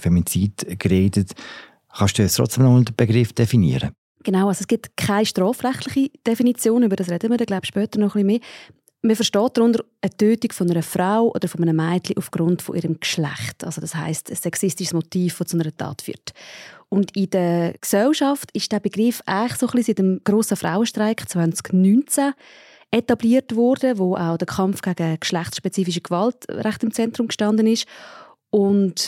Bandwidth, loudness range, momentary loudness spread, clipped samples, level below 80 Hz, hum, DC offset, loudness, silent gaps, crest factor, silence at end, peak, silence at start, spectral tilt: 16.5 kHz; 5 LU; 8 LU; under 0.1%; -52 dBFS; none; under 0.1%; -20 LUFS; 3.98-4.15 s; 18 dB; 0 s; -2 dBFS; 0 s; -5.5 dB/octave